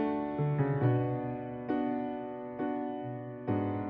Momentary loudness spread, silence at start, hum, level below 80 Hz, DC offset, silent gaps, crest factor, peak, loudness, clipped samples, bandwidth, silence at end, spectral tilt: 10 LU; 0 s; none; -64 dBFS; under 0.1%; none; 16 dB; -18 dBFS; -34 LUFS; under 0.1%; 4.4 kHz; 0 s; -9 dB/octave